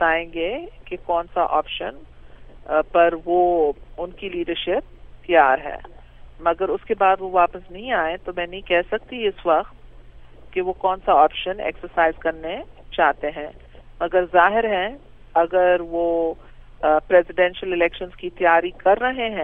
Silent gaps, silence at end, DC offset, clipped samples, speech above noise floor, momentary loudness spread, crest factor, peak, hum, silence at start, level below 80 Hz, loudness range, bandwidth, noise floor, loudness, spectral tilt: none; 0 s; under 0.1%; under 0.1%; 22 dB; 15 LU; 20 dB; -2 dBFS; none; 0 s; -44 dBFS; 3 LU; 3.9 kHz; -42 dBFS; -21 LUFS; -7.5 dB/octave